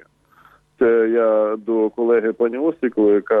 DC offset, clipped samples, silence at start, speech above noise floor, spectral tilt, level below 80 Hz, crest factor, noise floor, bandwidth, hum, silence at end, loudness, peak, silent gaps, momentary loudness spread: under 0.1%; under 0.1%; 0.8 s; 36 dB; -9 dB/octave; -64 dBFS; 12 dB; -53 dBFS; 3.8 kHz; none; 0 s; -18 LUFS; -6 dBFS; none; 5 LU